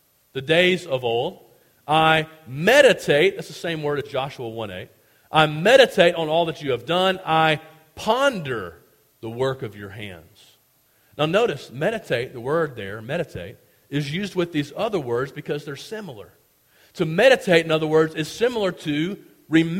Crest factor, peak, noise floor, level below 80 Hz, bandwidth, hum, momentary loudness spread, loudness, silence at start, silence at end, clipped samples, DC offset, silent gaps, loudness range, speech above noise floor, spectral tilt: 22 dB; 0 dBFS; -61 dBFS; -58 dBFS; 16.5 kHz; none; 17 LU; -21 LUFS; 0.35 s; 0 s; under 0.1%; under 0.1%; none; 8 LU; 40 dB; -5 dB/octave